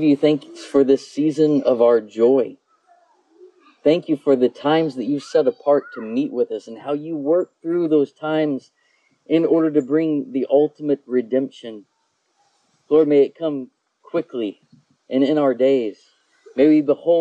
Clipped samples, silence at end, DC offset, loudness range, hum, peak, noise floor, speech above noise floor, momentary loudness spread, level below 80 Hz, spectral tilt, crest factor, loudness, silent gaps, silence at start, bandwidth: under 0.1%; 0 s; under 0.1%; 3 LU; none; -4 dBFS; -67 dBFS; 49 dB; 11 LU; -72 dBFS; -7 dB/octave; 14 dB; -19 LUFS; none; 0 s; 9 kHz